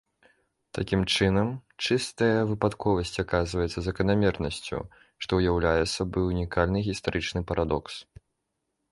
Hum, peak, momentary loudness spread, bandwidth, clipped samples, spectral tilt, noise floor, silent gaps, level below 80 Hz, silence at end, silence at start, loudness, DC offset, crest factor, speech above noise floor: none; -8 dBFS; 10 LU; 11.5 kHz; under 0.1%; -5.5 dB/octave; -80 dBFS; none; -42 dBFS; 0.9 s; 0.75 s; -27 LUFS; under 0.1%; 20 dB; 53 dB